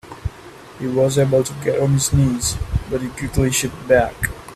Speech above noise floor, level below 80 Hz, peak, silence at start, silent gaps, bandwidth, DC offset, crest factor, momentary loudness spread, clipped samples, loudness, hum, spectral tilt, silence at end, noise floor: 22 dB; -34 dBFS; -2 dBFS; 0.05 s; none; 15.5 kHz; under 0.1%; 18 dB; 13 LU; under 0.1%; -19 LUFS; none; -5 dB/octave; 0 s; -40 dBFS